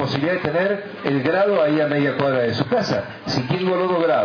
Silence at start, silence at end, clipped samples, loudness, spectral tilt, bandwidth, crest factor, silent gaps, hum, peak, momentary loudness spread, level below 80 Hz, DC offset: 0 s; 0 s; under 0.1%; -20 LUFS; -6.5 dB/octave; 5.4 kHz; 18 dB; none; none; -2 dBFS; 6 LU; -58 dBFS; under 0.1%